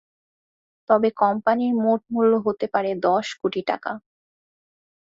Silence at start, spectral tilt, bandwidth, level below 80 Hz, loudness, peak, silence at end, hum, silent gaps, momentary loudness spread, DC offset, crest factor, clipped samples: 0.9 s; -6 dB/octave; 7.8 kHz; -68 dBFS; -22 LUFS; -4 dBFS; 1.1 s; none; none; 7 LU; under 0.1%; 18 dB; under 0.1%